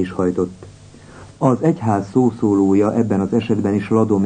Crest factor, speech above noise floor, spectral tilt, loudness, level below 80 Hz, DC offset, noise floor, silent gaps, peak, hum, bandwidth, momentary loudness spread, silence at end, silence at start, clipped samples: 16 dB; 24 dB; -8.5 dB/octave; -18 LUFS; -52 dBFS; under 0.1%; -41 dBFS; none; -2 dBFS; none; 9.6 kHz; 5 LU; 0 s; 0 s; under 0.1%